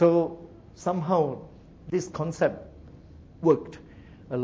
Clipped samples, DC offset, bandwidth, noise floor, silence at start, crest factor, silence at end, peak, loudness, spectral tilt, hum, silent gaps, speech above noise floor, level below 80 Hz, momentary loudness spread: under 0.1%; under 0.1%; 8 kHz; -48 dBFS; 0 s; 20 dB; 0 s; -8 dBFS; -27 LUFS; -7.5 dB/octave; none; none; 24 dB; -54 dBFS; 23 LU